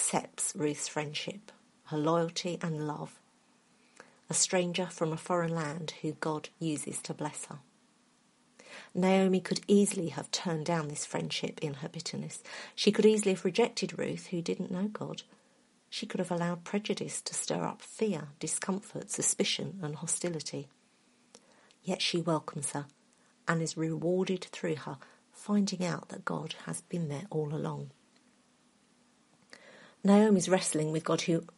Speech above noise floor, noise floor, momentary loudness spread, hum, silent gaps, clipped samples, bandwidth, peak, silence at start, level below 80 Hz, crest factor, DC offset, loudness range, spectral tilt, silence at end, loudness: 35 dB; -68 dBFS; 14 LU; none; none; under 0.1%; 11.5 kHz; -10 dBFS; 0 s; -78 dBFS; 24 dB; under 0.1%; 6 LU; -4.5 dB/octave; 0.1 s; -32 LUFS